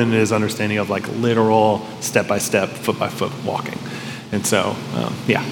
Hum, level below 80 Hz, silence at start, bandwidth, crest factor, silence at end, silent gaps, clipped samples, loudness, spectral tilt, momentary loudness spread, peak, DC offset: none; -62 dBFS; 0 s; 18 kHz; 18 dB; 0 s; none; under 0.1%; -20 LUFS; -4.5 dB/octave; 9 LU; 0 dBFS; under 0.1%